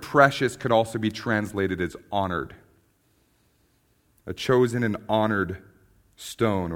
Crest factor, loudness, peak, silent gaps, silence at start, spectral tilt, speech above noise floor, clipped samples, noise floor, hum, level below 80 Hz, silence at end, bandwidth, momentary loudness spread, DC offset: 24 dB; -25 LUFS; -2 dBFS; none; 0 s; -6 dB/octave; 41 dB; under 0.1%; -65 dBFS; none; -56 dBFS; 0 s; 17 kHz; 18 LU; under 0.1%